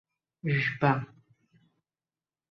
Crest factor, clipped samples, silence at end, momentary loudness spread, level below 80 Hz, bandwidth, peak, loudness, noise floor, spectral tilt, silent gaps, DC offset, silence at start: 22 dB; under 0.1%; 1.45 s; 13 LU; -68 dBFS; 6 kHz; -10 dBFS; -28 LUFS; under -90 dBFS; -8 dB/octave; none; under 0.1%; 0.45 s